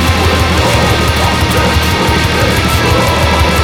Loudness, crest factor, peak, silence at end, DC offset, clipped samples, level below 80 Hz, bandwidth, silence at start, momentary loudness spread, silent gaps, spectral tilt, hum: -10 LUFS; 10 dB; 0 dBFS; 0 s; under 0.1%; under 0.1%; -18 dBFS; 18 kHz; 0 s; 1 LU; none; -4.5 dB/octave; none